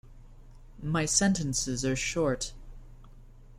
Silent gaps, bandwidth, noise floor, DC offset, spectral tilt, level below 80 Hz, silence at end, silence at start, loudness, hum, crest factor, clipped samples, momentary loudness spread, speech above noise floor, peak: none; 16 kHz; -50 dBFS; under 0.1%; -3.5 dB/octave; -46 dBFS; 0 s; 0.05 s; -28 LUFS; none; 22 dB; under 0.1%; 11 LU; 22 dB; -10 dBFS